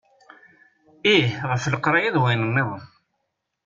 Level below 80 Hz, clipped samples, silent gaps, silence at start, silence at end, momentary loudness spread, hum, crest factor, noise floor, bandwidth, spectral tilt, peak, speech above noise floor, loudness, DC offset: -60 dBFS; under 0.1%; none; 1.05 s; 0.8 s; 7 LU; none; 18 dB; -77 dBFS; 7.6 kHz; -5.5 dB/octave; -6 dBFS; 56 dB; -21 LUFS; under 0.1%